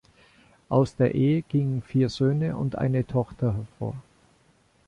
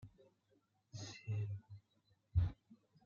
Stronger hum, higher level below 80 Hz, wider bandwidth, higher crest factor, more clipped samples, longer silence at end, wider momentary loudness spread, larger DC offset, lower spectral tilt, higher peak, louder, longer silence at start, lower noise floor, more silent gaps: neither; about the same, -52 dBFS vs -56 dBFS; first, 9.6 kHz vs 7.4 kHz; about the same, 18 dB vs 22 dB; neither; first, 0.85 s vs 0.3 s; second, 10 LU vs 22 LU; neither; first, -8.5 dB/octave vs -6 dB/octave; first, -8 dBFS vs -24 dBFS; first, -26 LUFS vs -44 LUFS; first, 0.7 s vs 0 s; second, -62 dBFS vs -79 dBFS; neither